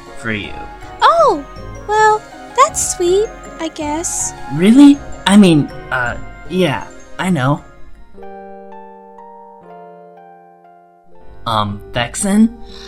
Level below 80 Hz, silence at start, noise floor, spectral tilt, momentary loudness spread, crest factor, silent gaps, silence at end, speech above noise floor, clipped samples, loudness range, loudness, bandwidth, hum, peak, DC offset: -40 dBFS; 0 s; -45 dBFS; -4.5 dB/octave; 23 LU; 16 dB; none; 0 s; 31 dB; 0.2%; 12 LU; -14 LUFS; 15 kHz; none; 0 dBFS; under 0.1%